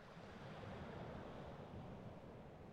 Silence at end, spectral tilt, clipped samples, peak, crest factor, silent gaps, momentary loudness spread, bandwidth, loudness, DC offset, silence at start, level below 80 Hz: 0 s; -7 dB/octave; under 0.1%; -40 dBFS; 14 dB; none; 5 LU; 11.5 kHz; -54 LUFS; under 0.1%; 0 s; -66 dBFS